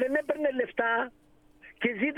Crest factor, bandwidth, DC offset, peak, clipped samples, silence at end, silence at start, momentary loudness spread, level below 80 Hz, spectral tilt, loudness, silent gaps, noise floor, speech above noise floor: 18 dB; 13 kHz; under 0.1%; -12 dBFS; under 0.1%; 0 s; 0 s; 4 LU; -66 dBFS; -6 dB/octave; -29 LUFS; none; -55 dBFS; 26 dB